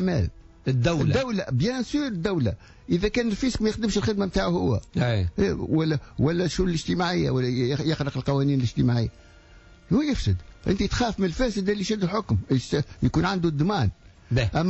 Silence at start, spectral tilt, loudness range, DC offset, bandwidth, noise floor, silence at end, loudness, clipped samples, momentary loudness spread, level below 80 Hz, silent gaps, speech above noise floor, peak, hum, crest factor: 0 s; -6 dB/octave; 1 LU; under 0.1%; 8 kHz; -50 dBFS; 0 s; -25 LUFS; under 0.1%; 4 LU; -40 dBFS; none; 26 dB; -12 dBFS; none; 12 dB